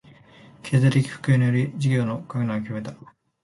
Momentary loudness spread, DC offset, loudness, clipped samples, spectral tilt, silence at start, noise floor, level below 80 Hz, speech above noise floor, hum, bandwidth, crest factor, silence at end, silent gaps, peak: 13 LU; under 0.1%; -23 LUFS; under 0.1%; -7.5 dB/octave; 0.65 s; -50 dBFS; -58 dBFS; 28 dB; none; 11.5 kHz; 16 dB; 0.5 s; none; -6 dBFS